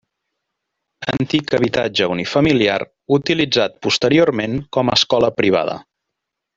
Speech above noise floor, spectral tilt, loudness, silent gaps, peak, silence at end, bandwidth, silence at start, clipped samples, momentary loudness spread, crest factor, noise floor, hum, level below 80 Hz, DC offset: 63 dB; -5 dB/octave; -17 LUFS; none; -2 dBFS; 0.75 s; 7.8 kHz; 1 s; under 0.1%; 8 LU; 16 dB; -79 dBFS; none; -50 dBFS; under 0.1%